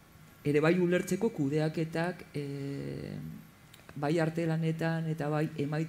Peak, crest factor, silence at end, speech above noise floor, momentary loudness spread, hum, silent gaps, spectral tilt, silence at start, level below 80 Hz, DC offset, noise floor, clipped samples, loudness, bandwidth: -16 dBFS; 16 dB; 0 s; 23 dB; 13 LU; none; none; -7 dB/octave; 0.2 s; -66 dBFS; under 0.1%; -54 dBFS; under 0.1%; -32 LUFS; 15.5 kHz